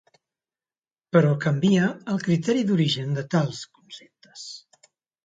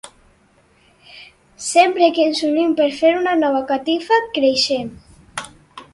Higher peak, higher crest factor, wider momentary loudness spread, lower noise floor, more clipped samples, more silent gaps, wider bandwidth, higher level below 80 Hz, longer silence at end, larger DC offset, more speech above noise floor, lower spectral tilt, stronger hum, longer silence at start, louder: second, -4 dBFS vs 0 dBFS; about the same, 20 dB vs 18 dB; first, 21 LU vs 17 LU; first, under -90 dBFS vs -55 dBFS; neither; neither; second, 9 kHz vs 11.5 kHz; second, -66 dBFS vs -58 dBFS; first, 0.65 s vs 0.1 s; neither; first, over 68 dB vs 39 dB; first, -6.5 dB/octave vs -2.5 dB/octave; neither; first, 1.15 s vs 0.05 s; second, -23 LUFS vs -17 LUFS